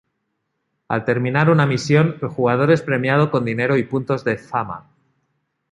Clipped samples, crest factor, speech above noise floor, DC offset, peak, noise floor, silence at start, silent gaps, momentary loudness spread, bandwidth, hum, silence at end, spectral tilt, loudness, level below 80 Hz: under 0.1%; 18 dB; 56 dB; under 0.1%; -2 dBFS; -74 dBFS; 0.9 s; none; 9 LU; 9 kHz; none; 0.9 s; -7 dB/octave; -19 LUFS; -58 dBFS